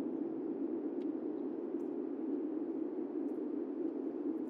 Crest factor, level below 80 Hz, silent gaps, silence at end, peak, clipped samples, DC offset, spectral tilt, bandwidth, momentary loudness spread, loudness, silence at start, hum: 12 dB; under -90 dBFS; none; 0 s; -28 dBFS; under 0.1%; under 0.1%; -9.5 dB/octave; 3.9 kHz; 1 LU; -40 LUFS; 0 s; none